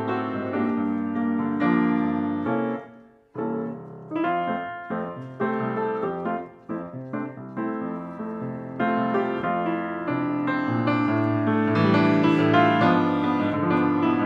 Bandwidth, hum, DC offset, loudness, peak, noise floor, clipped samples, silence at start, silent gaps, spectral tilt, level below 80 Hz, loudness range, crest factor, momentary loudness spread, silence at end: 6.6 kHz; none; under 0.1%; -24 LUFS; -6 dBFS; -49 dBFS; under 0.1%; 0 s; none; -8.5 dB/octave; -68 dBFS; 9 LU; 18 dB; 14 LU; 0 s